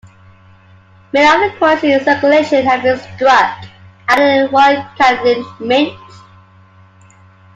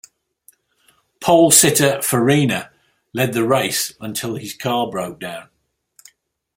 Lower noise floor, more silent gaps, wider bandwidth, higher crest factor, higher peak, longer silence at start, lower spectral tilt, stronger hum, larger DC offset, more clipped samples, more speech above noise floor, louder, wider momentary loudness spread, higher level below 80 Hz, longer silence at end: second, -44 dBFS vs -70 dBFS; neither; second, 10.5 kHz vs 16.5 kHz; second, 14 dB vs 20 dB; about the same, 0 dBFS vs 0 dBFS; about the same, 1.15 s vs 1.2 s; about the same, -4.5 dB/octave vs -3.5 dB/octave; neither; neither; neither; second, 32 dB vs 53 dB; first, -12 LUFS vs -16 LUFS; second, 8 LU vs 17 LU; about the same, -54 dBFS vs -58 dBFS; first, 1.6 s vs 1.15 s